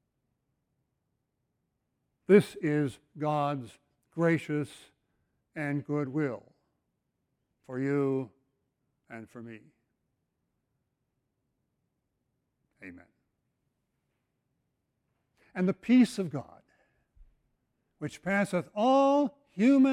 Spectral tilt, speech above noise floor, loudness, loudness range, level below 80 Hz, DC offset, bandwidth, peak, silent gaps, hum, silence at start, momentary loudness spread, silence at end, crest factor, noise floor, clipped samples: -7 dB/octave; 53 dB; -29 LUFS; 11 LU; -72 dBFS; under 0.1%; 15.5 kHz; -8 dBFS; none; none; 2.3 s; 23 LU; 0 s; 24 dB; -81 dBFS; under 0.1%